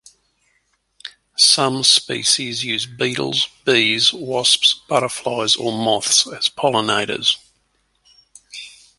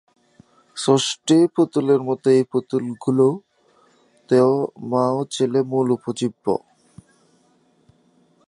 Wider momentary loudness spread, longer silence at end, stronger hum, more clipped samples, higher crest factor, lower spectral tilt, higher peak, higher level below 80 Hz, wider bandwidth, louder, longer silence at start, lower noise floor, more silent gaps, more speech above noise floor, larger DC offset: first, 16 LU vs 9 LU; second, 0.3 s vs 1.9 s; neither; neither; about the same, 20 dB vs 20 dB; second, -1.5 dB/octave vs -6 dB/octave; about the same, 0 dBFS vs -2 dBFS; first, -62 dBFS vs -68 dBFS; about the same, 12 kHz vs 11.5 kHz; first, -16 LUFS vs -20 LUFS; first, 1.05 s vs 0.75 s; first, -65 dBFS vs -60 dBFS; neither; first, 47 dB vs 41 dB; neither